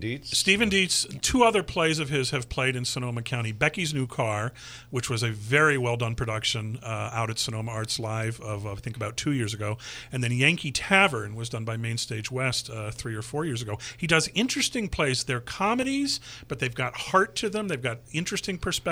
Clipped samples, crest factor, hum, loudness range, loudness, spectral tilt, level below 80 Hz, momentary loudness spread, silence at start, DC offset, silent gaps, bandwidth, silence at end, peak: under 0.1%; 22 dB; none; 5 LU; -26 LUFS; -4 dB/octave; -50 dBFS; 12 LU; 0 s; under 0.1%; none; 16 kHz; 0 s; -4 dBFS